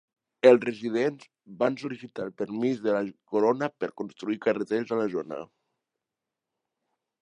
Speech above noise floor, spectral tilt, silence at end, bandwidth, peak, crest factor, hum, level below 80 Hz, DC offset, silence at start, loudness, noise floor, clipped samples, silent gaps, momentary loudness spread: 61 dB; -6.5 dB/octave; 1.8 s; 9.6 kHz; -4 dBFS; 24 dB; none; -78 dBFS; under 0.1%; 0.45 s; -27 LUFS; -88 dBFS; under 0.1%; none; 15 LU